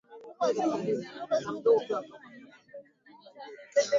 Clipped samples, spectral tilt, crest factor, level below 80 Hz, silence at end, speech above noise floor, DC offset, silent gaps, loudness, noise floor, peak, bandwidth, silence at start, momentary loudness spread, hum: under 0.1%; -4.5 dB/octave; 18 dB; -78 dBFS; 0 s; 27 dB; under 0.1%; none; -30 LUFS; -56 dBFS; -12 dBFS; 7.6 kHz; 0.1 s; 24 LU; none